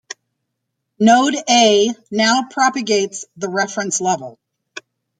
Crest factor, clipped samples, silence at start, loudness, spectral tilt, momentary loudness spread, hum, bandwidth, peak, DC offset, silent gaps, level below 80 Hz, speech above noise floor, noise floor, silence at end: 18 dB; under 0.1%; 1 s; -16 LUFS; -2.5 dB/octave; 24 LU; none; 9.6 kHz; 0 dBFS; under 0.1%; none; -66 dBFS; 60 dB; -76 dBFS; 0.4 s